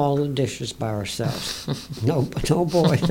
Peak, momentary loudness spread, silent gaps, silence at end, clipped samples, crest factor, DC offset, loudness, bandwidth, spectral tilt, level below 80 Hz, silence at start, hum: -6 dBFS; 9 LU; none; 0 s; under 0.1%; 16 dB; under 0.1%; -24 LUFS; 17 kHz; -6 dB/octave; -44 dBFS; 0 s; none